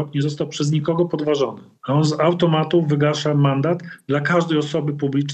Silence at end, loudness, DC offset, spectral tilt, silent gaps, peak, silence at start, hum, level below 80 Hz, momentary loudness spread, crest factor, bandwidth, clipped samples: 0 s; -20 LUFS; under 0.1%; -6.5 dB/octave; none; -4 dBFS; 0 s; none; -62 dBFS; 6 LU; 14 dB; 8.6 kHz; under 0.1%